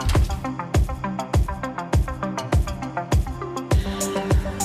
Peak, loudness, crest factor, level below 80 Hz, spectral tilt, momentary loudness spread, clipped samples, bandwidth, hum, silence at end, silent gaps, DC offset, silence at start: -10 dBFS; -24 LUFS; 12 dB; -26 dBFS; -5.5 dB/octave; 6 LU; under 0.1%; 15 kHz; none; 0 s; none; under 0.1%; 0 s